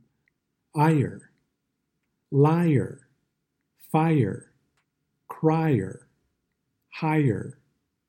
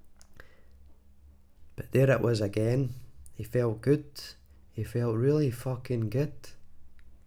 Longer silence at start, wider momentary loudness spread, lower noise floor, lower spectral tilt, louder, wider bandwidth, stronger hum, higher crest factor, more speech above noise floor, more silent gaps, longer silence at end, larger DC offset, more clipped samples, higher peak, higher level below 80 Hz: first, 0.75 s vs 0.05 s; second, 15 LU vs 20 LU; first, -79 dBFS vs -55 dBFS; first, -9 dB/octave vs -7.5 dB/octave; first, -24 LUFS vs -29 LUFS; about the same, 16.5 kHz vs 16 kHz; neither; about the same, 20 dB vs 18 dB; first, 56 dB vs 27 dB; neither; first, 0.55 s vs 0.1 s; neither; neither; first, -8 dBFS vs -12 dBFS; second, -68 dBFS vs -54 dBFS